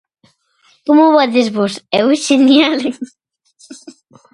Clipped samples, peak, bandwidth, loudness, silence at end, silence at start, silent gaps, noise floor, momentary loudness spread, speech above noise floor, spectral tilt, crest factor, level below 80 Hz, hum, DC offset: under 0.1%; 0 dBFS; 11.5 kHz; -12 LUFS; 0.45 s; 0.85 s; none; -55 dBFS; 15 LU; 43 dB; -4 dB/octave; 14 dB; -64 dBFS; none; under 0.1%